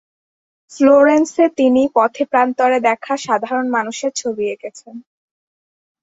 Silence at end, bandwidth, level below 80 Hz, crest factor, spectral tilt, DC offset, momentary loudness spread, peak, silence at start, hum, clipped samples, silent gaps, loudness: 1.05 s; 8 kHz; -62 dBFS; 16 dB; -3.5 dB/octave; under 0.1%; 11 LU; -2 dBFS; 0.7 s; none; under 0.1%; none; -15 LUFS